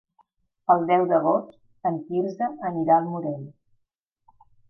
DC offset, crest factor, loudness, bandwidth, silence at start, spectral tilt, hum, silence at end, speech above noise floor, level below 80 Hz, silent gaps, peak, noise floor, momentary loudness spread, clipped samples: under 0.1%; 20 dB; -24 LUFS; 6 kHz; 0.7 s; -9.5 dB/octave; none; 1.2 s; 53 dB; -76 dBFS; none; -6 dBFS; -76 dBFS; 13 LU; under 0.1%